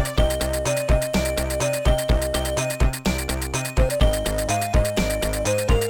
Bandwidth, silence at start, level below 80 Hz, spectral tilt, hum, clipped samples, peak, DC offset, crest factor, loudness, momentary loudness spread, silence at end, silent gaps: 19.5 kHz; 0 s; -26 dBFS; -4.5 dB/octave; none; under 0.1%; -8 dBFS; under 0.1%; 14 dB; -22 LUFS; 3 LU; 0 s; none